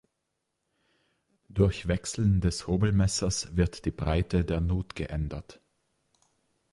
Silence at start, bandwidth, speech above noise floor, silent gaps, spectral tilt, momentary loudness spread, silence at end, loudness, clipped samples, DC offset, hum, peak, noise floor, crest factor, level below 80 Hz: 1.55 s; 11.5 kHz; 54 dB; none; -6 dB/octave; 9 LU; 1.2 s; -28 LUFS; under 0.1%; under 0.1%; none; -10 dBFS; -81 dBFS; 18 dB; -38 dBFS